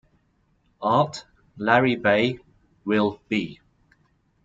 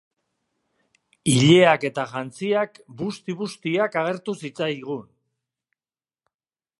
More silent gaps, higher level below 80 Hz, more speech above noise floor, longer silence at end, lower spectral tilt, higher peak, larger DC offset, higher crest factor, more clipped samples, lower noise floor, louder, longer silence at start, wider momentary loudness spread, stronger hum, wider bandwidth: neither; about the same, -60 dBFS vs -64 dBFS; second, 44 dB vs over 68 dB; second, 0.9 s vs 1.75 s; about the same, -6 dB/octave vs -5 dB/octave; about the same, -4 dBFS vs -2 dBFS; neither; about the same, 22 dB vs 22 dB; neither; second, -66 dBFS vs under -90 dBFS; about the same, -23 LUFS vs -22 LUFS; second, 0.8 s vs 1.25 s; about the same, 17 LU vs 16 LU; neither; second, 7.8 kHz vs 11.5 kHz